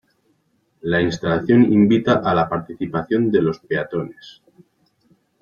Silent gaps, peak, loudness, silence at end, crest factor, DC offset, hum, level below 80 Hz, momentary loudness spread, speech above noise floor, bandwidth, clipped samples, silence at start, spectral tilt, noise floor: none; -4 dBFS; -18 LUFS; 1.1 s; 16 dB; under 0.1%; none; -52 dBFS; 12 LU; 47 dB; 7.2 kHz; under 0.1%; 0.85 s; -7.5 dB/octave; -65 dBFS